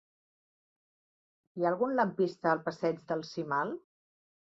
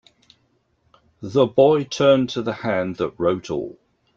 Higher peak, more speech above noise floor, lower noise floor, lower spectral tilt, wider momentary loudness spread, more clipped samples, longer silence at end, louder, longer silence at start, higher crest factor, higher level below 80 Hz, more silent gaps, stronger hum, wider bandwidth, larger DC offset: second, -14 dBFS vs -2 dBFS; first, over 59 dB vs 46 dB; first, under -90 dBFS vs -65 dBFS; about the same, -7 dB/octave vs -6 dB/octave; second, 8 LU vs 13 LU; neither; first, 0.7 s vs 0.45 s; second, -32 LUFS vs -20 LUFS; first, 1.55 s vs 1.2 s; about the same, 20 dB vs 18 dB; second, -80 dBFS vs -58 dBFS; neither; neither; about the same, 7.8 kHz vs 7.4 kHz; neither